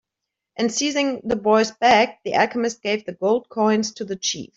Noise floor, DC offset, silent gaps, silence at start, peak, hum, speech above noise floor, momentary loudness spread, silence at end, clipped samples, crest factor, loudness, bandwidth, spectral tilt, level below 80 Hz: -83 dBFS; under 0.1%; none; 0.6 s; -4 dBFS; none; 63 dB; 9 LU; 0.1 s; under 0.1%; 18 dB; -21 LUFS; 7.8 kHz; -3 dB/octave; -58 dBFS